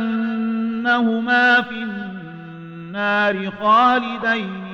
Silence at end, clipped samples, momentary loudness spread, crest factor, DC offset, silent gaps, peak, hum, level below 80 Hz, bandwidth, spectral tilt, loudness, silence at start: 0 s; under 0.1%; 19 LU; 14 dB; under 0.1%; none; -4 dBFS; none; -60 dBFS; 7 kHz; -6 dB/octave; -18 LUFS; 0 s